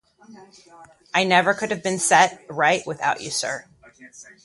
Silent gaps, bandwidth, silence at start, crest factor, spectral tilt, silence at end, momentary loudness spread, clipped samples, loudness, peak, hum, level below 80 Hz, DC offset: none; 11.5 kHz; 0.3 s; 20 dB; -2.5 dB/octave; 0.2 s; 9 LU; under 0.1%; -20 LUFS; -2 dBFS; none; -66 dBFS; under 0.1%